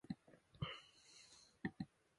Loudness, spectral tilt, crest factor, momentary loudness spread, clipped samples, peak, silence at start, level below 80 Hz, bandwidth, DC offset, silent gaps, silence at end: -53 LUFS; -5.5 dB/octave; 22 dB; 14 LU; under 0.1%; -30 dBFS; 0.1 s; -72 dBFS; 11.5 kHz; under 0.1%; none; 0.35 s